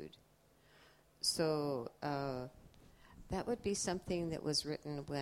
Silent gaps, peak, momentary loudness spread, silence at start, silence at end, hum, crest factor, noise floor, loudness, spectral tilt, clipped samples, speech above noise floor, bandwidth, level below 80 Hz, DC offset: none; -20 dBFS; 9 LU; 0 s; 0 s; none; 20 dB; -69 dBFS; -39 LUFS; -4 dB/octave; under 0.1%; 30 dB; 16 kHz; -62 dBFS; under 0.1%